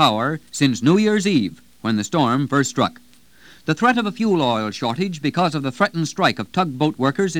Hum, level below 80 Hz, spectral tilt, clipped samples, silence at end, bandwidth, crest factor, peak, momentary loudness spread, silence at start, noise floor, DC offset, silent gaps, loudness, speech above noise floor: none; -60 dBFS; -5 dB/octave; under 0.1%; 0 s; 16.5 kHz; 18 dB; 0 dBFS; 7 LU; 0 s; -50 dBFS; 0.3%; none; -20 LUFS; 31 dB